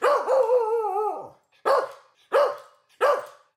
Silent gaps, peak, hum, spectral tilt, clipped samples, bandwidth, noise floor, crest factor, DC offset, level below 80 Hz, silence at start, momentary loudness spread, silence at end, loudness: none; -8 dBFS; none; -2.5 dB/octave; under 0.1%; 14.5 kHz; -43 dBFS; 16 dB; under 0.1%; -80 dBFS; 0 s; 10 LU; 0.25 s; -24 LUFS